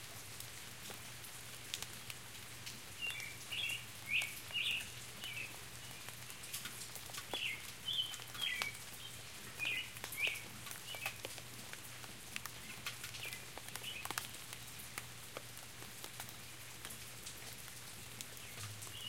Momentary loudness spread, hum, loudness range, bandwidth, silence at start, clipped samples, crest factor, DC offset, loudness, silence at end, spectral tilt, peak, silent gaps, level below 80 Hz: 11 LU; none; 8 LU; 17 kHz; 0 s; under 0.1%; 32 dB; 0.1%; -44 LUFS; 0 s; -1 dB/octave; -14 dBFS; none; -70 dBFS